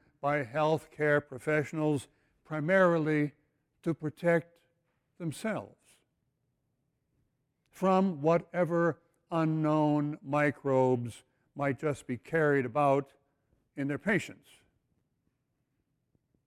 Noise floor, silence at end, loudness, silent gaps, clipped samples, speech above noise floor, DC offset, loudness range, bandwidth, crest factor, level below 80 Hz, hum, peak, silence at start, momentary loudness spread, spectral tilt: -80 dBFS; 2.15 s; -30 LUFS; none; under 0.1%; 50 dB; under 0.1%; 7 LU; 15.5 kHz; 18 dB; -70 dBFS; none; -14 dBFS; 0.25 s; 11 LU; -7.5 dB/octave